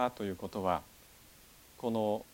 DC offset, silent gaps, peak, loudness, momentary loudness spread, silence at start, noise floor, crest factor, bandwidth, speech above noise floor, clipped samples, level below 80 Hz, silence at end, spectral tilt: under 0.1%; none; -16 dBFS; -36 LUFS; 23 LU; 0 s; -59 dBFS; 20 dB; 17.5 kHz; 24 dB; under 0.1%; -64 dBFS; 0.1 s; -6 dB/octave